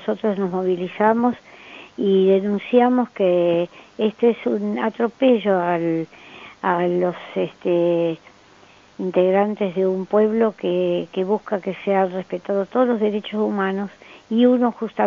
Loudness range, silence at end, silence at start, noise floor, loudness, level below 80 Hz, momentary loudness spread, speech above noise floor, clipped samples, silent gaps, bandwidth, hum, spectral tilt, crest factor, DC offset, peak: 3 LU; 0 s; 0 s; -50 dBFS; -20 LUFS; -68 dBFS; 10 LU; 30 dB; under 0.1%; none; 7 kHz; none; -5.5 dB/octave; 16 dB; under 0.1%; -4 dBFS